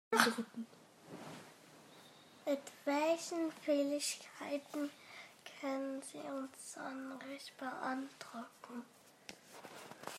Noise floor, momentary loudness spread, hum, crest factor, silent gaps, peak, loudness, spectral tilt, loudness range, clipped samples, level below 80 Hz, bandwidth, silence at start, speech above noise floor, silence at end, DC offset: -61 dBFS; 21 LU; none; 28 dB; none; -12 dBFS; -41 LUFS; -2.5 dB/octave; 8 LU; under 0.1%; under -90 dBFS; 16 kHz; 0.1 s; 21 dB; 0 s; under 0.1%